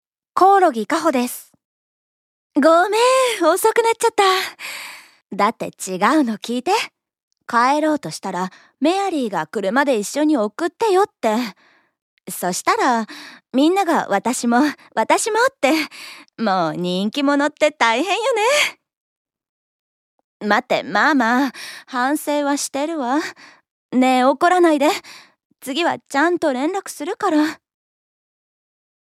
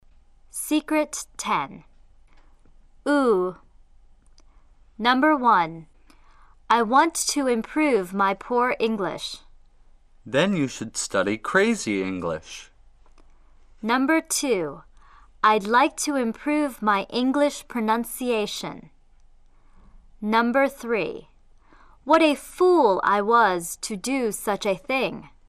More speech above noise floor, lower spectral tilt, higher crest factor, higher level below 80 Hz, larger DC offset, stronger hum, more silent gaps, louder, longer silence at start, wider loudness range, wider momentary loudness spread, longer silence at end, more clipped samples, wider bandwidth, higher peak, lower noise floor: first, over 72 dB vs 30 dB; about the same, -3.5 dB/octave vs -3.5 dB/octave; about the same, 18 dB vs 18 dB; second, -74 dBFS vs -54 dBFS; neither; neither; first, 1.65-2.50 s, 5.26-5.30 s, 7.23-7.31 s, 12.02-12.17 s, 18.97-19.25 s, 19.49-20.40 s, 23.70-23.89 s, 25.45-25.50 s vs none; first, -18 LUFS vs -23 LUFS; second, 0.35 s vs 0.55 s; about the same, 4 LU vs 6 LU; about the same, 12 LU vs 13 LU; first, 1.5 s vs 0.2 s; neither; first, 16 kHz vs 14 kHz; first, 0 dBFS vs -6 dBFS; first, under -90 dBFS vs -53 dBFS